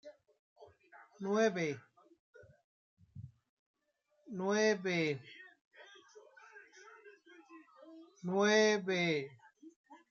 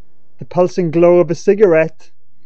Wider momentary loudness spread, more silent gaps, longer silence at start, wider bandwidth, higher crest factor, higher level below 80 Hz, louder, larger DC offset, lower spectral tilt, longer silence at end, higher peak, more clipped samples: first, 28 LU vs 8 LU; first, 0.39-0.56 s, 2.20-2.34 s, 2.64-2.97 s, 3.49-3.74 s, 5.61-5.71 s, 9.76-9.84 s vs none; second, 0.05 s vs 0.4 s; about the same, 7.4 kHz vs 7.4 kHz; first, 20 dB vs 14 dB; second, -84 dBFS vs -62 dBFS; second, -33 LUFS vs -13 LUFS; second, under 0.1% vs 4%; second, -4.5 dB/octave vs -7.5 dB/octave; second, 0.15 s vs 0.6 s; second, -18 dBFS vs 0 dBFS; neither